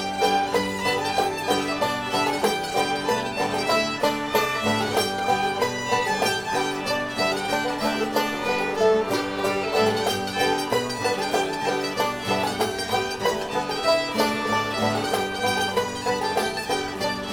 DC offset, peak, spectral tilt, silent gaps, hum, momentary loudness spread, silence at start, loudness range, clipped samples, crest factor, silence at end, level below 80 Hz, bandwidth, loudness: under 0.1%; -8 dBFS; -3.5 dB/octave; none; none; 3 LU; 0 s; 1 LU; under 0.1%; 16 dB; 0 s; -54 dBFS; over 20 kHz; -24 LUFS